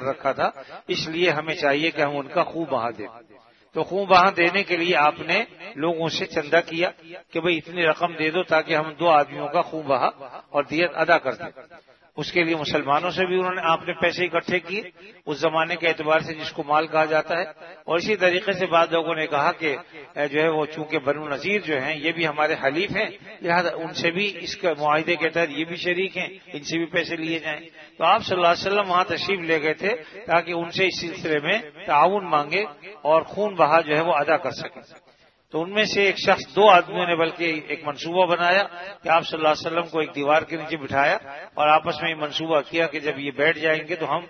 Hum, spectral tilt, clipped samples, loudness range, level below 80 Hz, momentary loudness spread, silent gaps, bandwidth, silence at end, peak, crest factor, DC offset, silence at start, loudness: none; -4.5 dB/octave; under 0.1%; 3 LU; -64 dBFS; 10 LU; none; 6.6 kHz; 0 s; 0 dBFS; 22 dB; under 0.1%; 0 s; -22 LUFS